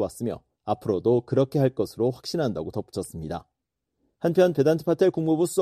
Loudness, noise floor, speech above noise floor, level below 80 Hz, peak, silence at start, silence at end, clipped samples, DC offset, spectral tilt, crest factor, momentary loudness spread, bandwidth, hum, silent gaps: -25 LUFS; -82 dBFS; 58 dB; -56 dBFS; -8 dBFS; 0 s; 0 s; under 0.1%; under 0.1%; -7 dB/octave; 18 dB; 12 LU; 14.5 kHz; none; none